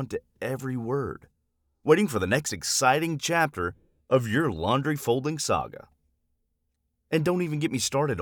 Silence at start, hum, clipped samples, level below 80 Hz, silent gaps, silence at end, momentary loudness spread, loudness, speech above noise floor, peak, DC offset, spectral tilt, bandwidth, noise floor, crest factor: 0 s; none; under 0.1%; -58 dBFS; none; 0 s; 11 LU; -26 LUFS; 51 dB; -4 dBFS; under 0.1%; -4.5 dB/octave; over 20 kHz; -76 dBFS; 22 dB